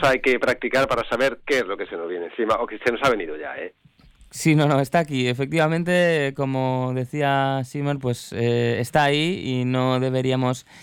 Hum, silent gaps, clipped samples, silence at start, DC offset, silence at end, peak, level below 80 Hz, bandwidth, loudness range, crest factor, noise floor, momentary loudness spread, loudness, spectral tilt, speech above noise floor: none; none; under 0.1%; 0 s; under 0.1%; 0 s; -6 dBFS; -54 dBFS; 17.5 kHz; 3 LU; 16 dB; -52 dBFS; 9 LU; -22 LUFS; -6 dB/octave; 30 dB